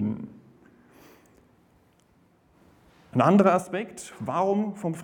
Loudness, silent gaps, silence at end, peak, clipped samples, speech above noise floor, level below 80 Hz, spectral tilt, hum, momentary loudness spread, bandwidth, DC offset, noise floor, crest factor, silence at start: -25 LUFS; none; 0 s; -6 dBFS; under 0.1%; 39 dB; -68 dBFS; -7 dB/octave; none; 18 LU; 12.5 kHz; under 0.1%; -62 dBFS; 22 dB; 0 s